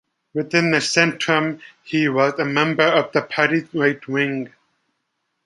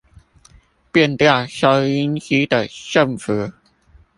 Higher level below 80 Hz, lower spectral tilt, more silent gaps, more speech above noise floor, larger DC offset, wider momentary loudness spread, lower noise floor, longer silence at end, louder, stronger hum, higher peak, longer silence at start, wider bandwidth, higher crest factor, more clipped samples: second, -68 dBFS vs -52 dBFS; about the same, -4.5 dB/octave vs -5.5 dB/octave; neither; first, 55 dB vs 35 dB; neither; first, 11 LU vs 8 LU; first, -74 dBFS vs -52 dBFS; first, 1 s vs 0.65 s; about the same, -19 LUFS vs -17 LUFS; neither; about the same, -2 dBFS vs 0 dBFS; second, 0.35 s vs 0.95 s; about the same, 11.5 kHz vs 11.5 kHz; about the same, 20 dB vs 18 dB; neither